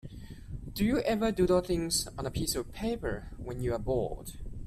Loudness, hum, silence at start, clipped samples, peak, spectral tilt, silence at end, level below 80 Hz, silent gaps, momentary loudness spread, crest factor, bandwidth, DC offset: -31 LUFS; none; 0.05 s; under 0.1%; -14 dBFS; -5 dB/octave; 0 s; -44 dBFS; none; 17 LU; 16 dB; 15.5 kHz; under 0.1%